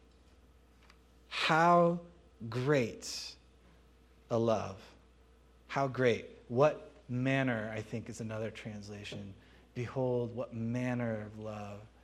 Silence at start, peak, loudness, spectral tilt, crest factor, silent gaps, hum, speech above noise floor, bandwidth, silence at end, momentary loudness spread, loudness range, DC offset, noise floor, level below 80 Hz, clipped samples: 1.3 s; -12 dBFS; -34 LUFS; -6 dB/octave; 22 dB; none; none; 29 dB; 14 kHz; 0.15 s; 16 LU; 6 LU; under 0.1%; -62 dBFS; -64 dBFS; under 0.1%